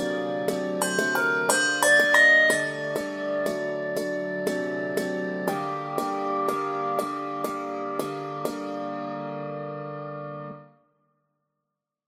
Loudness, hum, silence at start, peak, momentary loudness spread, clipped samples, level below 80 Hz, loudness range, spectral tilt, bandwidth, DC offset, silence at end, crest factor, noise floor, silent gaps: -25 LUFS; none; 0 s; -4 dBFS; 15 LU; under 0.1%; -72 dBFS; 13 LU; -3 dB/octave; 16.5 kHz; under 0.1%; 1.45 s; 22 dB; -84 dBFS; none